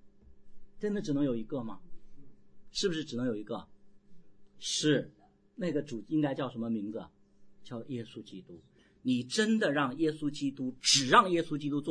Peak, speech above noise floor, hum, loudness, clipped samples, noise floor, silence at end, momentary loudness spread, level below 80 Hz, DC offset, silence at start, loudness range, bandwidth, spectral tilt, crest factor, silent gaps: -8 dBFS; 23 dB; none; -31 LUFS; under 0.1%; -54 dBFS; 0 s; 19 LU; -62 dBFS; under 0.1%; 0 s; 9 LU; 10.5 kHz; -3.5 dB/octave; 24 dB; none